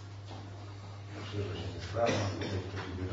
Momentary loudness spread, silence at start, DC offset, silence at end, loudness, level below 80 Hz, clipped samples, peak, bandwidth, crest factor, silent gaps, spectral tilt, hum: 15 LU; 0 s; under 0.1%; 0 s; -37 LUFS; -58 dBFS; under 0.1%; -18 dBFS; 7.6 kHz; 18 dB; none; -5 dB/octave; none